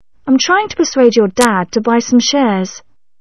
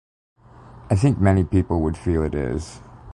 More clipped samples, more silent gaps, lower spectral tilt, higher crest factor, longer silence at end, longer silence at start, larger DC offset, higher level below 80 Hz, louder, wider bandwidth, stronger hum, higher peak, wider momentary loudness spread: neither; neither; second, -4 dB/octave vs -8 dB/octave; about the same, 14 dB vs 16 dB; first, 0.4 s vs 0 s; second, 0.25 s vs 0.7 s; first, 0.6% vs under 0.1%; second, -52 dBFS vs -32 dBFS; first, -12 LUFS vs -21 LUFS; about the same, 11 kHz vs 11 kHz; neither; first, 0 dBFS vs -6 dBFS; second, 5 LU vs 12 LU